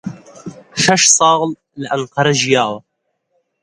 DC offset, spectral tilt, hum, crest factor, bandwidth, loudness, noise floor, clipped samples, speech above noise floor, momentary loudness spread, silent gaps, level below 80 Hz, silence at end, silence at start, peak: under 0.1%; -2.5 dB/octave; none; 16 dB; 11.5 kHz; -13 LUFS; -70 dBFS; under 0.1%; 55 dB; 23 LU; none; -56 dBFS; 0.85 s; 0.05 s; 0 dBFS